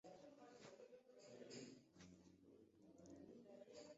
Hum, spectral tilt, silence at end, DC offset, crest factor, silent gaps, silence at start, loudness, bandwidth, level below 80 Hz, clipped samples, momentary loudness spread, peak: none; -4.5 dB/octave; 0 s; under 0.1%; 20 dB; none; 0.05 s; -64 LUFS; 7.6 kHz; -88 dBFS; under 0.1%; 8 LU; -44 dBFS